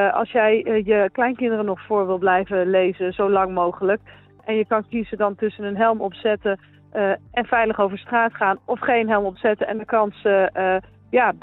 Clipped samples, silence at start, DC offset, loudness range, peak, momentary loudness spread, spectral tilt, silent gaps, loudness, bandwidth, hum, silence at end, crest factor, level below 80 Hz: under 0.1%; 0 s; under 0.1%; 3 LU; -6 dBFS; 6 LU; -9.5 dB/octave; none; -21 LUFS; 4.1 kHz; none; 0.05 s; 16 dB; -54 dBFS